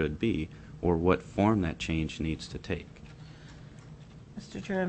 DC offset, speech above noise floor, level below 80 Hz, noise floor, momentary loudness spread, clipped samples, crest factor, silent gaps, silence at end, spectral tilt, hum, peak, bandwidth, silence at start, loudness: under 0.1%; 19 dB; -46 dBFS; -49 dBFS; 22 LU; under 0.1%; 22 dB; none; 0 s; -7 dB/octave; none; -10 dBFS; 8.6 kHz; 0 s; -31 LUFS